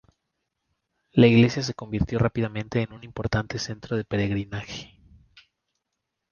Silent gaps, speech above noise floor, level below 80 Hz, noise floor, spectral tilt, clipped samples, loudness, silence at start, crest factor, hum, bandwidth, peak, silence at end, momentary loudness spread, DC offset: none; 58 dB; -46 dBFS; -82 dBFS; -6.5 dB/octave; under 0.1%; -25 LUFS; 1.15 s; 22 dB; none; 7 kHz; -4 dBFS; 1.45 s; 16 LU; under 0.1%